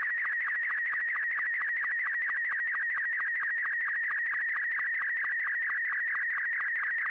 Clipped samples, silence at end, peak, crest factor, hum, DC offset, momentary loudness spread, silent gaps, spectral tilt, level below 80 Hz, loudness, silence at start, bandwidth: under 0.1%; 0 s; -26 dBFS; 6 dB; none; under 0.1%; 0 LU; none; -1.5 dB/octave; -82 dBFS; -29 LUFS; 0 s; 5.2 kHz